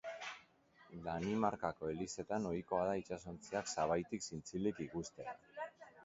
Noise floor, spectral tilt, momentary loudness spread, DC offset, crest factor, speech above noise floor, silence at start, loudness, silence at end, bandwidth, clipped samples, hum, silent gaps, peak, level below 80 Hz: -68 dBFS; -5 dB/octave; 12 LU; under 0.1%; 22 dB; 27 dB; 0.05 s; -42 LUFS; 0 s; 7.6 kHz; under 0.1%; none; none; -20 dBFS; -66 dBFS